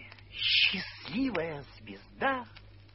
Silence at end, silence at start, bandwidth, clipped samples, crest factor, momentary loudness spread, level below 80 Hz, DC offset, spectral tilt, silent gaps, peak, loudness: 0.1 s; 0 s; 6 kHz; under 0.1%; 20 dB; 24 LU; -58 dBFS; under 0.1%; -6.5 dB/octave; none; -12 dBFS; -29 LUFS